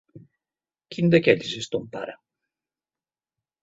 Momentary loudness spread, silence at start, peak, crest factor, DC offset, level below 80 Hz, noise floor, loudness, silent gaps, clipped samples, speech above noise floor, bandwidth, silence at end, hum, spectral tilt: 18 LU; 0.15 s; -2 dBFS; 24 dB; under 0.1%; -64 dBFS; under -90 dBFS; -22 LUFS; none; under 0.1%; over 68 dB; 8 kHz; 1.5 s; none; -6 dB/octave